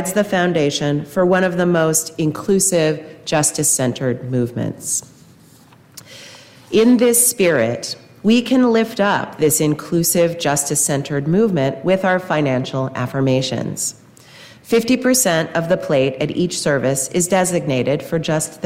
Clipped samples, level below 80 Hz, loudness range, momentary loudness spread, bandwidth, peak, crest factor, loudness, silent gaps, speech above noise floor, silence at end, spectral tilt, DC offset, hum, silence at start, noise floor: under 0.1%; -54 dBFS; 4 LU; 8 LU; 16 kHz; -2 dBFS; 14 dB; -17 LUFS; none; 30 dB; 0 s; -4 dB/octave; under 0.1%; none; 0 s; -47 dBFS